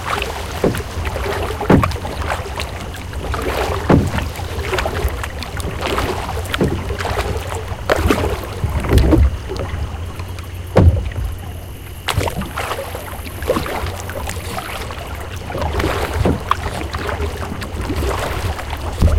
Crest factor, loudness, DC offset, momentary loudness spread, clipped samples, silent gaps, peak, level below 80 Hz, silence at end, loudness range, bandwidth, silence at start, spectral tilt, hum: 18 dB; -20 LUFS; under 0.1%; 12 LU; under 0.1%; none; 0 dBFS; -24 dBFS; 0 s; 5 LU; 17 kHz; 0 s; -6 dB/octave; none